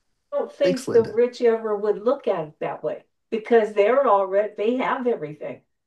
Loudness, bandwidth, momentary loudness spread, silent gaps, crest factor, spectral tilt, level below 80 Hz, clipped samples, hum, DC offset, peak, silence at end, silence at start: -22 LUFS; 12 kHz; 12 LU; none; 16 dB; -6 dB/octave; -74 dBFS; under 0.1%; none; under 0.1%; -6 dBFS; 0.3 s; 0.3 s